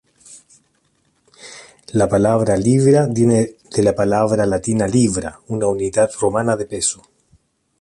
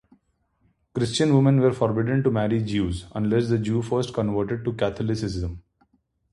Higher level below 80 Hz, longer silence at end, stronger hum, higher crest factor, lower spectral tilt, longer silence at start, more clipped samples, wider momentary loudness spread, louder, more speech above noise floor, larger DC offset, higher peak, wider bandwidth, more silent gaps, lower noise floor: about the same, -46 dBFS vs -44 dBFS; first, 0.85 s vs 0.7 s; neither; about the same, 16 dB vs 16 dB; about the same, -6 dB/octave vs -7 dB/octave; second, 0.3 s vs 0.95 s; neither; about the same, 11 LU vs 9 LU; first, -17 LUFS vs -24 LUFS; about the same, 47 dB vs 46 dB; neither; first, -2 dBFS vs -6 dBFS; about the same, 11.5 kHz vs 11.5 kHz; neither; second, -63 dBFS vs -68 dBFS